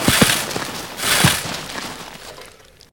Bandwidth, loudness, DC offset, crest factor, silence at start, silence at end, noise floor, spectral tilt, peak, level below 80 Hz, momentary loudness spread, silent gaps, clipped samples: 19.5 kHz; -18 LUFS; 0.2%; 20 dB; 0 s; 0.45 s; -44 dBFS; -2.5 dB/octave; 0 dBFS; -42 dBFS; 21 LU; none; under 0.1%